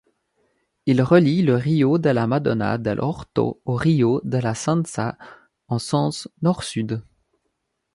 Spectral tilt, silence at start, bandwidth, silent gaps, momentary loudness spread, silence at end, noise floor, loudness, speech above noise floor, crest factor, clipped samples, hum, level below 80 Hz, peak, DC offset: -7 dB/octave; 0.85 s; 11.5 kHz; none; 11 LU; 0.95 s; -75 dBFS; -21 LUFS; 55 dB; 20 dB; under 0.1%; none; -54 dBFS; -2 dBFS; under 0.1%